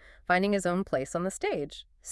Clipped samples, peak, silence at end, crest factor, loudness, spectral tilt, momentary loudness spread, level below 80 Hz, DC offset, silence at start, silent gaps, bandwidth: under 0.1%; -10 dBFS; 0 s; 20 dB; -29 LUFS; -5 dB/octave; 11 LU; -56 dBFS; under 0.1%; 0.1 s; none; 12 kHz